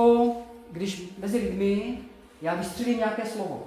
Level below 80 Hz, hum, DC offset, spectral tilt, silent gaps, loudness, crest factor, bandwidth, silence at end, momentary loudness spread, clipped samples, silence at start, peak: -54 dBFS; none; under 0.1%; -6 dB/octave; none; -28 LUFS; 16 dB; 15.5 kHz; 0 s; 12 LU; under 0.1%; 0 s; -10 dBFS